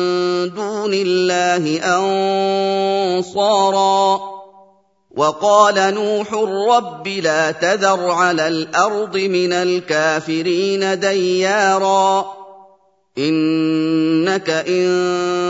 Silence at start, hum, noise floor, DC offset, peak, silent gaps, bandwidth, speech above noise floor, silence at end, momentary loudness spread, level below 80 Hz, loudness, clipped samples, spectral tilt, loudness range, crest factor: 0 s; none; -53 dBFS; under 0.1%; 0 dBFS; none; 8 kHz; 37 dB; 0 s; 5 LU; -70 dBFS; -16 LUFS; under 0.1%; -4 dB/octave; 1 LU; 16 dB